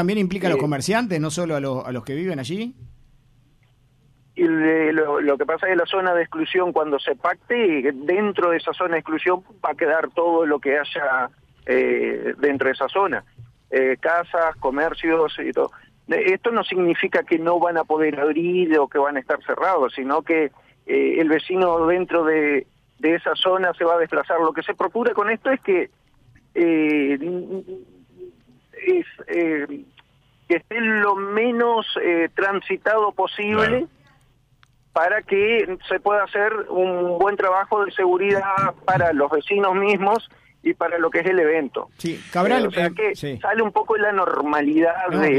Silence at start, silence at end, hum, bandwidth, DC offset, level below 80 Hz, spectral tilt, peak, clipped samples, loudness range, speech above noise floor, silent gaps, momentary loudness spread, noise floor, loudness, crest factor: 0 s; 0 s; none; 12.5 kHz; under 0.1%; -58 dBFS; -5.5 dB/octave; -8 dBFS; under 0.1%; 4 LU; 38 dB; none; 7 LU; -58 dBFS; -21 LUFS; 12 dB